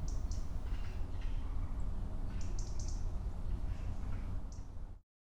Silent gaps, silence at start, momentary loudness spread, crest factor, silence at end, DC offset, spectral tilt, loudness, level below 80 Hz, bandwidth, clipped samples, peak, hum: none; 0 s; 7 LU; 10 dB; 0.3 s; under 0.1%; -6 dB/octave; -44 LUFS; -38 dBFS; 8.4 kHz; under 0.1%; -26 dBFS; none